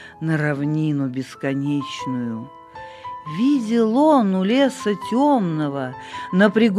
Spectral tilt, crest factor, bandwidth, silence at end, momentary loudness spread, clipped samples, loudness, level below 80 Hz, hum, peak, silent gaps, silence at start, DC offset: -7 dB/octave; 16 dB; 12 kHz; 0 s; 17 LU; under 0.1%; -20 LUFS; -64 dBFS; none; -4 dBFS; none; 0 s; under 0.1%